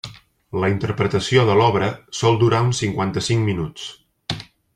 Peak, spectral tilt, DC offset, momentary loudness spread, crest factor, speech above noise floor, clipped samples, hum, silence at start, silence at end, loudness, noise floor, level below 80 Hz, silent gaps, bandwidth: -2 dBFS; -5.5 dB/octave; under 0.1%; 15 LU; 18 dB; 21 dB; under 0.1%; none; 0.05 s; 0.35 s; -20 LUFS; -40 dBFS; -50 dBFS; none; 11.5 kHz